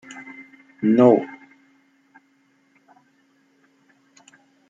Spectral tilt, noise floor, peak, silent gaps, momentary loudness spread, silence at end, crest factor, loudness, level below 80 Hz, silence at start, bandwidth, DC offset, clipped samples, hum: -8 dB/octave; -62 dBFS; -2 dBFS; none; 26 LU; 3.35 s; 22 dB; -17 LUFS; -74 dBFS; 0.15 s; 7.6 kHz; under 0.1%; under 0.1%; none